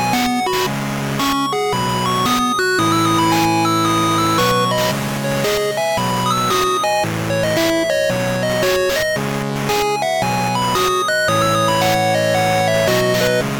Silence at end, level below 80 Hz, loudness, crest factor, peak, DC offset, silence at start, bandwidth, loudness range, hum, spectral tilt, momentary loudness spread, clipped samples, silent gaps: 0 s; -44 dBFS; -16 LUFS; 12 dB; -4 dBFS; under 0.1%; 0 s; 19.5 kHz; 2 LU; none; -4 dB/octave; 4 LU; under 0.1%; none